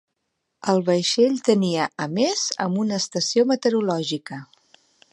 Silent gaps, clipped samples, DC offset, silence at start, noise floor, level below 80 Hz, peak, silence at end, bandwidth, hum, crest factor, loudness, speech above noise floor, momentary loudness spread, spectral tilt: none; under 0.1%; under 0.1%; 0.65 s; -77 dBFS; -72 dBFS; -4 dBFS; 0.7 s; 11.5 kHz; none; 18 dB; -22 LUFS; 56 dB; 9 LU; -4.5 dB/octave